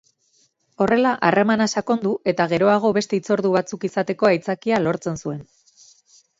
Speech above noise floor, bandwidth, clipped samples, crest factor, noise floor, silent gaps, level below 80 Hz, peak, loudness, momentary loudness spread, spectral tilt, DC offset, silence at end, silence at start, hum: 43 dB; 7.8 kHz; under 0.1%; 18 dB; -63 dBFS; none; -60 dBFS; -4 dBFS; -20 LUFS; 8 LU; -5.5 dB/octave; under 0.1%; 0.95 s; 0.8 s; none